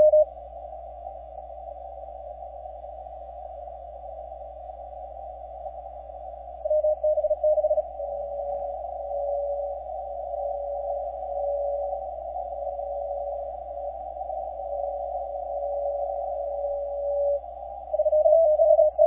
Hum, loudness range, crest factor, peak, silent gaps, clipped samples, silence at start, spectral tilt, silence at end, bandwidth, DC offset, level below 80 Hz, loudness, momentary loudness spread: none; 13 LU; 18 dB; -8 dBFS; none; under 0.1%; 0 s; -10 dB/octave; 0 s; 2.1 kHz; under 0.1%; -50 dBFS; -27 LUFS; 17 LU